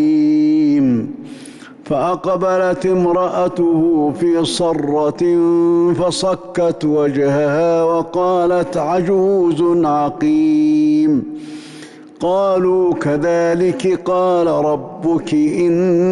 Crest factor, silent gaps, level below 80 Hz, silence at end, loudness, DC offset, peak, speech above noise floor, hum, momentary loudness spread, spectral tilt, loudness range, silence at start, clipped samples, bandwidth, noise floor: 8 dB; none; -50 dBFS; 0 s; -15 LUFS; under 0.1%; -8 dBFS; 22 dB; none; 6 LU; -6.5 dB/octave; 2 LU; 0 s; under 0.1%; 11 kHz; -36 dBFS